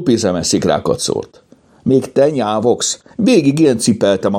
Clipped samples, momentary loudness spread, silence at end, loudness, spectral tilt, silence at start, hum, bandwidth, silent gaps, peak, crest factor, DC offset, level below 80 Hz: under 0.1%; 6 LU; 0 s; -14 LUFS; -5 dB/octave; 0 s; none; 16.5 kHz; none; 0 dBFS; 14 dB; under 0.1%; -50 dBFS